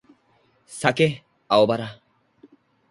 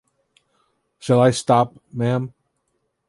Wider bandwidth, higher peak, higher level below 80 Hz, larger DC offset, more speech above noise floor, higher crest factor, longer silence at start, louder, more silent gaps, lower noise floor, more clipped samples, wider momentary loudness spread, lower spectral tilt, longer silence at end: about the same, 11.5 kHz vs 11.5 kHz; about the same, 0 dBFS vs -2 dBFS; about the same, -64 dBFS vs -60 dBFS; neither; second, 42 dB vs 54 dB; about the same, 24 dB vs 20 dB; second, 0.7 s vs 1.05 s; about the same, -21 LUFS vs -19 LUFS; neither; second, -63 dBFS vs -72 dBFS; neither; first, 19 LU vs 14 LU; about the same, -5 dB/octave vs -6 dB/octave; first, 1 s vs 0.8 s